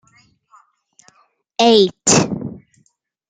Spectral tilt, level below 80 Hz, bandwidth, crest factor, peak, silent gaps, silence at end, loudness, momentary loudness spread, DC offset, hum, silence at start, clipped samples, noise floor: -3.5 dB/octave; -54 dBFS; 10 kHz; 18 dB; 0 dBFS; none; 0.7 s; -14 LUFS; 18 LU; under 0.1%; none; 1.6 s; under 0.1%; -63 dBFS